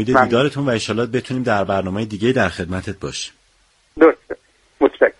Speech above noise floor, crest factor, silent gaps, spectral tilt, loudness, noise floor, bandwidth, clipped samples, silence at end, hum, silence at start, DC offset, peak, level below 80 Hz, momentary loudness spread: 39 dB; 18 dB; none; -5.5 dB/octave; -18 LUFS; -58 dBFS; 11.5 kHz; under 0.1%; 0.1 s; none; 0 s; under 0.1%; 0 dBFS; -48 dBFS; 13 LU